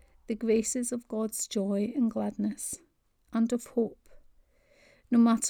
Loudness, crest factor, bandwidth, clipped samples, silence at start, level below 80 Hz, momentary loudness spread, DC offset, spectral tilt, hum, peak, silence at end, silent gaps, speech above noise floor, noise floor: -30 LUFS; 16 dB; 17 kHz; under 0.1%; 0.3 s; -64 dBFS; 9 LU; under 0.1%; -5 dB/octave; none; -14 dBFS; 0 s; none; 35 dB; -63 dBFS